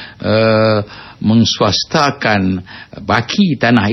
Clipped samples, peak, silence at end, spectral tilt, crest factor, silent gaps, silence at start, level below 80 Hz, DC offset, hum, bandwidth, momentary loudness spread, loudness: under 0.1%; 0 dBFS; 0 s; -5.5 dB/octave; 12 dB; none; 0 s; -46 dBFS; under 0.1%; none; 6.2 kHz; 10 LU; -14 LUFS